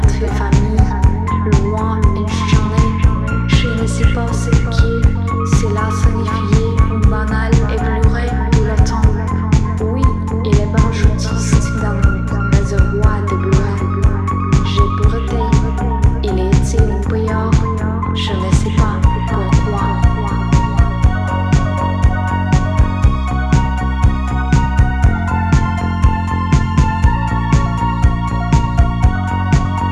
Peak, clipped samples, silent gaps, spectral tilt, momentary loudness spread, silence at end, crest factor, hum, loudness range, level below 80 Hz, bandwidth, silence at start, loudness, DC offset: 0 dBFS; under 0.1%; none; -7 dB/octave; 4 LU; 0 s; 12 dB; none; 1 LU; -16 dBFS; 10.5 kHz; 0 s; -15 LUFS; under 0.1%